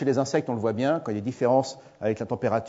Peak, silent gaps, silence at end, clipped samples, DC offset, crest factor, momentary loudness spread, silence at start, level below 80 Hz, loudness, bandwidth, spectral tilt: -10 dBFS; none; 0 s; under 0.1%; under 0.1%; 16 dB; 8 LU; 0 s; -66 dBFS; -26 LUFS; 8 kHz; -6.5 dB/octave